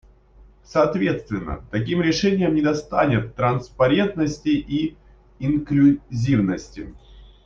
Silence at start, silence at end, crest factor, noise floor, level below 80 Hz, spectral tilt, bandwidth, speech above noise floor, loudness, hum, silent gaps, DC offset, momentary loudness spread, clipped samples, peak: 0.75 s; 0.2 s; 16 dB; -50 dBFS; -44 dBFS; -7 dB/octave; 7.4 kHz; 30 dB; -21 LUFS; none; none; under 0.1%; 11 LU; under 0.1%; -4 dBFS